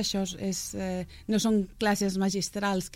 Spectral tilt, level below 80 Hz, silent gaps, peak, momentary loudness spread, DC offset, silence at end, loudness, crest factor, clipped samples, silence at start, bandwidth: -4.5 dB/octave; -52 dBFS; none; -12 dBFS; 7 LU; under 0.1%; 0 s; -29 LUFS; 16 dB; under 0.1%; 0 s; 16 kHz